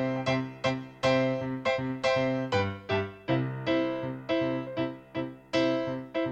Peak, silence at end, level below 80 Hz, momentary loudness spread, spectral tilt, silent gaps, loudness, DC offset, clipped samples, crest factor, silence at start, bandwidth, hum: -14 dBFS; 0 s; -60 dBFS; 7 LU; -6.5 dB/octave; none; -30 LUFS; under 0.1%; under 0.1%; 16 dB; 0 s; 9 kHz; none